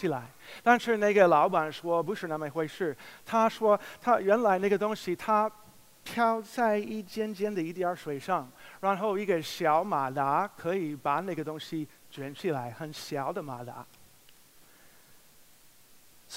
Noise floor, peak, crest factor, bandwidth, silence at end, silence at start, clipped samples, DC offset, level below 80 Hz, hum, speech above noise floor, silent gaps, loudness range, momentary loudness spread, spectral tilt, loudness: -57 dBFS; -6 dBFS; 24 dB; 16 kHz; 0 s; 0 s; under 0.1%; under 0.1%; -74 dBFS; none; 28 dB; none; 11 LU; 14 LU; -5.5 dB/octave; -29 LUFS